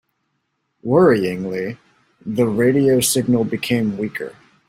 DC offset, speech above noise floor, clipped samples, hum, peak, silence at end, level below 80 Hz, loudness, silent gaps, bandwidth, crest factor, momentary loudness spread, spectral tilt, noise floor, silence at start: under 0.1%; 54 dB; under 0.1%; none; -2 dBFS; 0.35 s; -56 dBFS; -18 LUFS; none; 16.5 kHz; 16 dB; 16 LU; -5 dB/octave; -71 dBFS; 0.85 s